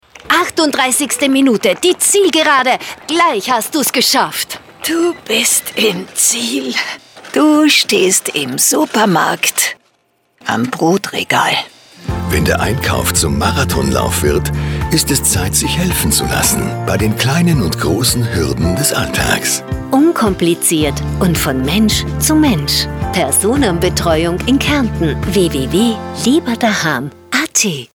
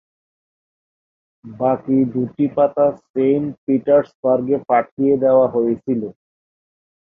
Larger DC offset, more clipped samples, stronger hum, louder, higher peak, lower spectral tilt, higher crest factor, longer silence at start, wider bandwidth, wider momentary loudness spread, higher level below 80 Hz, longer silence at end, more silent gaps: neither; neither; neither; first, -13 LUFS vs -18 LUFS; about the same, 0 dBFS vs -2 dBFS; second, -3.5 dB/octave vs -11 dB/octave; about the same, 14 dB vs 16 dB; second, 0.25 s vs 1.45 s; first, 19.5 kHz vs 3.7 kHz; about the same, 6 LU vs 7 LU; first, -32 dBFS vs -60 dBFS; second, 0.1 s vs 1 s; second, none vs 3.10-3.14 s, 3.58-3.67 s, 4.15-4.23 s, 4.91-4.97 s